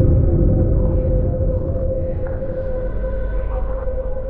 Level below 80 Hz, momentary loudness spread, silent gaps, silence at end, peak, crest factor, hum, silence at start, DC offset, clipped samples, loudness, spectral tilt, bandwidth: -20 dBFS; 9 LU; none; 0 s; -4 dBFS; 14 dB; none; 0 s; under 0.1%; under 0.1%; -21 LUFS; -13.5 dB/octave; 2.6 kHz